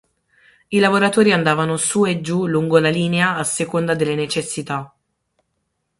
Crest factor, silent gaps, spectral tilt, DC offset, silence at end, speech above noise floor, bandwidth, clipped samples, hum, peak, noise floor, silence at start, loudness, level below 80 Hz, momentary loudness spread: 18 dB; none; -4.5 dB/octave; under 0.1%; 1.15 s; 55 dB; 11.5 kHz; under 0.1%; none; -2 dBFS; -72 dBFS; 0.7 s; -18 LUFS; -58 dBFS; 8 LU